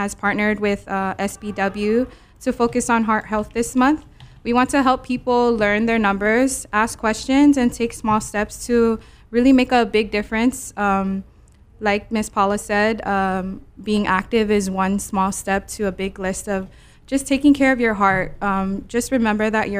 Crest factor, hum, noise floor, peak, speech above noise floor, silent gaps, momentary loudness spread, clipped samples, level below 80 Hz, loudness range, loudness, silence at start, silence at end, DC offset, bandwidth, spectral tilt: 18 dB; none; -48 dBFS; -2 dBFS; 29 dB; none; 10 LU; under 0.1%; -42 dBFS; 3 LU; -19 LUFS; 0 s; 0 s; under 0.1%; 16 kHz; -5 dB/octave